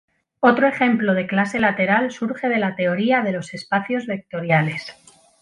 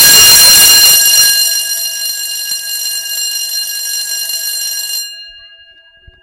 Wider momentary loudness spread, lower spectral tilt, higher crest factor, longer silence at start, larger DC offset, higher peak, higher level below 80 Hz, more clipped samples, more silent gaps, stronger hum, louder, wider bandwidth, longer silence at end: second, 9 LU vs 15 LU; first, -6.5 dB/octave vs 2.5 dB/octave; first, 18 dB vs 10 dB; first, 0.4 s vs 0 s; neither; about the same, -2 dBFS vs 0 dBFS; second, -62 dBFS vs -44 dBFS; second, under 0.1% vs 2%; neither; neither; second, -20 LUFS vs -7 LUFS; second, 11 kHz vs over 20 kHz; second, 0.5 s vs 0.85 s